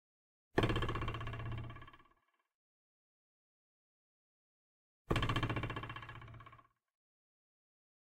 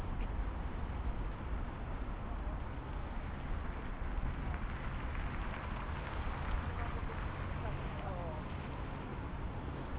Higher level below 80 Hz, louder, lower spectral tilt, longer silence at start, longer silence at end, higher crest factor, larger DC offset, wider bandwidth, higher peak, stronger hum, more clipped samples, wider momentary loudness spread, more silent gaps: second, -52 dBFS vs -42 dBFS; first, -39 LUFS vs -42 LUFS; about the same, -6.5 dB/octave vs -6 dB/octave; first, 0.55 s vs 0 s; first, 1.6 s vs 0 s; first, 26 dB vs 14 dB; neither; first, 15 kHz vs 4 kHz; first, -18 dBFS vs -24 dBFS; neither; neither; first, 20 LU vs 3 LU; first, 2.55-5.05 s vs none